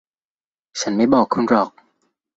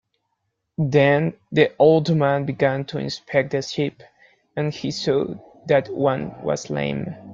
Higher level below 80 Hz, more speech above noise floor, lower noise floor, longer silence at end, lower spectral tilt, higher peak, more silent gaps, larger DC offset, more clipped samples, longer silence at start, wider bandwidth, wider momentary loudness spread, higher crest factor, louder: about the same, -58 dBFS vs -58 dBFS; first, over 73 dB vs 55 dB; first, under -90 dBFS vs -75 dBFS; first, 0.7 s vs 0 s; second, -5 dB/octave vs -6.5 dB/octave; about the same, -2 dBFS vs -4 dBFS; neither; neither; neither; about the same, 0.75 s vs 0.8 s; about the same, 8 kHz vs 7.6 kHz; about the same, 11 LU vs 11 LU; about the same, 18 dB vs 18 dB; first, -18 LUFS vs -21 LUFS